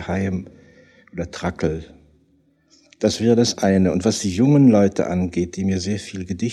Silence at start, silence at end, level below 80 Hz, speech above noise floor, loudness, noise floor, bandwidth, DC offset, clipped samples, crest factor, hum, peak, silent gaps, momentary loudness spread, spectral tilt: 0 s; 0 s; -48 dBFS; 41 dB; -19 LUFS; -60 dBFS; 12.5 kHz; under 0.1%; under 0.1%; 16 dB; none; -4 dBFS; none; 15 LU; -6 dB/octave